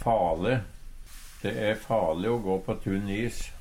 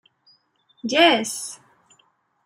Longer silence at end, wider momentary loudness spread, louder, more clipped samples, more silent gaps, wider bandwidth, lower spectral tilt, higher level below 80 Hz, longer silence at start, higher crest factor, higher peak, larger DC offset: second, 0 s vs 0.9 s; about the same, 19 LU vs 18 LU; second, -29 LUFS vs -19 LUFS; neither; neither; about the same, 16 kHz vs 16 kHz; first, -6.5 dB/octave vs -2 dB/octave; first, -42 dBFS vs -76 dBFS; second, 0 s vs 0.85 s; second, 16 dB vs 22 dB; second, -12 dBFS vs -2 dBFS; neither